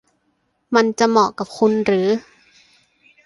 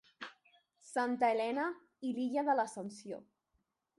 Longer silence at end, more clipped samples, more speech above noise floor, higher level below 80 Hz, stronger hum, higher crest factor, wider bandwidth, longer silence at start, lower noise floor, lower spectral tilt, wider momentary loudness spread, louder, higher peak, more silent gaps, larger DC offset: first, 1.05 s vs 0.8 s; neither; first, 51 dB vs 47 dB; first, -62 dBFS vs -86 dBFS; neither; about the same, 18 dB vs 18 dB; about the same, 11.5 kHz vs 11.5 kHz; first, 0.7 s vs 0.2 s; second, -67 dBFS vs -82 dBFS; about the same, -5 dB/octave vs -4.5 dB/octave; second, 5 LU vs 17 LU; first, -18 LUFS vs -36 LUFS; first, -2 dBFS vs -20 dBFS; neither; neither